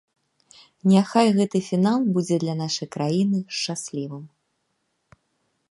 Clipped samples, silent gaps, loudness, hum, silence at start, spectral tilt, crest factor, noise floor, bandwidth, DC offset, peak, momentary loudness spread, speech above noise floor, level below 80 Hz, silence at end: under 0.1%; none; -22 LUFS; none; 0.85 s; -6 dB/octave; 20 dB; -73 dBFS; 11.5 kHz; under 0.1%; -4 dBFS; 12 LU; 52 dB; -70 dBFS; 1.45 s